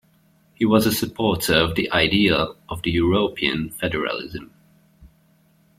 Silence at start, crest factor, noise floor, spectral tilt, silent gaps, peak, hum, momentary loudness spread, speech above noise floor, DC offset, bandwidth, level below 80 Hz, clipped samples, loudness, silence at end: 0.6 s; 20 dB; -59 dBFS; -4.5 dB/octave; none; -2 dBFS; none; 10 LU; 38 dB; under 0.1%; 16.5 kHz; -46 dBFS; under 0.1%; -20 LUFS; 0.7 s